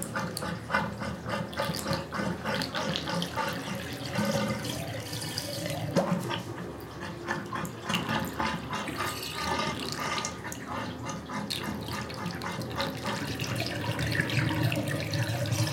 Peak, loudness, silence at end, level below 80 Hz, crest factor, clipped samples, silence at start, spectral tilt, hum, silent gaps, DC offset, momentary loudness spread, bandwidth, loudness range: -10 dBFS; -32 LUFS; 0 s; -54 dBFS; 22 dB; under 0.1%; 0 s; -4.5 dB/octave; none; none; under 0.1%; 7 LU; 17 kHz; 3 LU